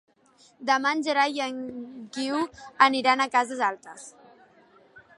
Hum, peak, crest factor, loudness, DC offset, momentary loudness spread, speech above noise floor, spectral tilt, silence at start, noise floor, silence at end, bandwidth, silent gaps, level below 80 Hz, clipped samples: none; -4 dBFS; 24 dB; -25 LUFS; under 0.1%; 19 LU; 34 dB; -2 dB/octave; 0.6 s; -60 dBFS; 0.2 s; 11.5 kHz; none; -74 dBFS; under 0.1%